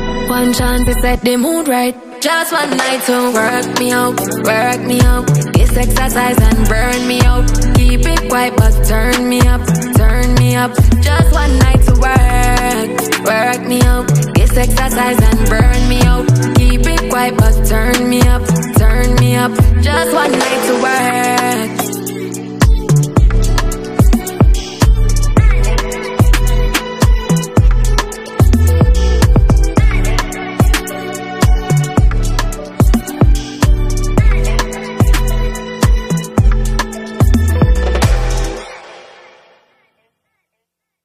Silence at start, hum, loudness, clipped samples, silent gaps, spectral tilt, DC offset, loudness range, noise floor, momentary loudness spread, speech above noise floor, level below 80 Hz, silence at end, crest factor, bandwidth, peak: 0 s; none; -13 LUFS; under 0.1%; none; -5.5 dB/octave; under 0.1%; 3 LU; -76 dBFS; 6 LU; 65 dB; -14 dBFS; 2.05 s; 10 dB; 15.5 kHz; 0 dBFS